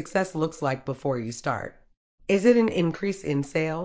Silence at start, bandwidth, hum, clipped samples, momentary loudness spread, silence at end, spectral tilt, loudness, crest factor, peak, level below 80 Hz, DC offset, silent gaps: 0 s; 8 kHz; none; under 0.1%; 10 LU; 0 s; -6.5 dB/octave; -26 LUFS; 18 dB; -8 dBFS; -58 dBFS; under 0.1%; 1.97-2.18 s